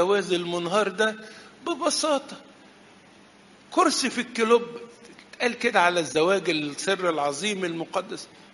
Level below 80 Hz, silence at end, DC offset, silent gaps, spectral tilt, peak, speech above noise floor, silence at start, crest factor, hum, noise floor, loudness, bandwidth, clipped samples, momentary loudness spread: -72 dBFS; 0.25 s; under 0.1%; none; -3 dB/octave; -6 dBFS; 28 dB; 0 s; 20 dB; none; -53 dBFS; -24 LUFS; 11.5 kHz; under 0.1%; 17 LU